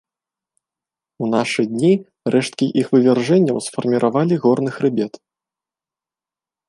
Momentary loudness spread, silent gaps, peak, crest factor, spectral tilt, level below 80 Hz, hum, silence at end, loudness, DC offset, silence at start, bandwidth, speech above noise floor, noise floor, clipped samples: 6 LU; none; -2 dBFS; 16 dB; -6.5 dB/octave; -66 dBFS; none; 1.6 s; -18 LUFS; under 0.1%; 1.2 s; 11.5 kHz; 73 dB; -90 dBFS; under 0.1%